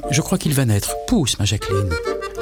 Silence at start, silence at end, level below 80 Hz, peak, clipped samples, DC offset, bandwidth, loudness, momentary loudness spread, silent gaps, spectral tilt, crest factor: 0 s; 0 s; -36 dBFS; -4 dBFS; under 0.1%; under 0.1%; 19 kHz; -20 LUFS; 5 LU; none; -4.5 dB/octave; 16 dB